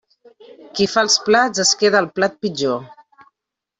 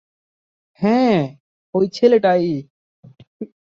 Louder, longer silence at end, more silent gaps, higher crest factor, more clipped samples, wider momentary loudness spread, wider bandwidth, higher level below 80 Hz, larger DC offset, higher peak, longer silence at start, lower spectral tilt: about the same, -17 LUFS vs -18 LUFS; first, 0.85 s vs 0.3 s; second, none vs 1.40-1.73 s, 2.70-3.03 s, 3.27-3.40 s; about the same, 18 dB vs 18 dB; neither; second, 9 LU vs 20 LU; first, 8.4 kHz vs 7.4 kHz; about the same, -60 dBFS vs -62 dBFS; neither; about the same, -2 dBFS vs -2 dBFS; second, 0.65 s vs 0.8 s; second, -2 dB/octave vs -7.5 dB/octave